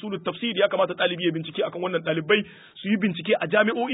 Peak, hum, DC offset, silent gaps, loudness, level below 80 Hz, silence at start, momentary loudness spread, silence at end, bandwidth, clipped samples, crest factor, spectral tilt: -6 dBFS; none; under 0.1%; none; -24 LUFS; -70 dBFS; 0 s; 7 LU; 0 s; 4 kHz; under 0.1%; 20 dB; -10 dB/octave